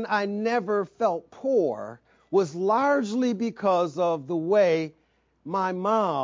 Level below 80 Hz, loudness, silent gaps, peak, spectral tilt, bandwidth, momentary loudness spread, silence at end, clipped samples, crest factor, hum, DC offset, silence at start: -74 dBFS; -25 LUFS; none; -10 dBFS; -6.5 dB/octave; 7.6 kHz; 8 LU; 0 s; under 0.1%; 14 dB; none; under 0.1%; 0 s